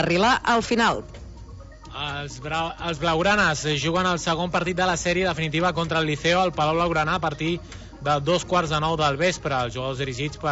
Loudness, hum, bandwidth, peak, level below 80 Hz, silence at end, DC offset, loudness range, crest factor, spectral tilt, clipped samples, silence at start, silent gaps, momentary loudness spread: -23 LUFS; none; 8 kHz; -6 dBFS; -44 dBFS; 0 s; under 0.1%; 2 LU; 18 dB; -4.5 dB/octave; under 0.1%; 0 s; none; 12 LU